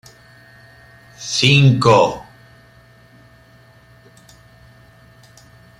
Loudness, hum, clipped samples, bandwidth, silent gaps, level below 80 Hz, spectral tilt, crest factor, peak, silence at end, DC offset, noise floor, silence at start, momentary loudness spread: -13 LUFS; none; under 0.1%; 11.5 kHz; none; -52 dBFS; -5 dB/octave; 20 dB; -2 dBFS; 3.55 s; under 0.1%; -48 dBFS; 1.2 s; 19 LU